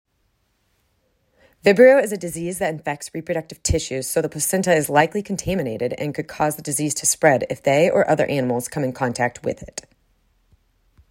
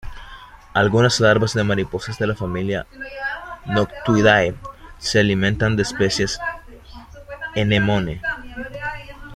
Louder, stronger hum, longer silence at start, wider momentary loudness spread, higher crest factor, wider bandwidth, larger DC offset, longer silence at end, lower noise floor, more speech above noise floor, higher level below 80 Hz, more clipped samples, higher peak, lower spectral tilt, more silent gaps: about the same, -20 LUFS vs -20 LUFS; neither; first, 1.65 s vs 0.05 s; second, 11 LU vs 18 LU; about the same, 20 dB vs 18 dB; first, 16.5 kHz vs 12.5 kHz; neither; first, 1.3 s vs 0 s; first, -67 dBFS vs -41 dBFS; first, 48 dB vs 22 dB; about the same, -42 dBFS vs -40 dBFS; neither; about the same, -2 dBFS vs -2 dBFS; about the same, -4.5 dB/octave vs -5 dB/octave; neither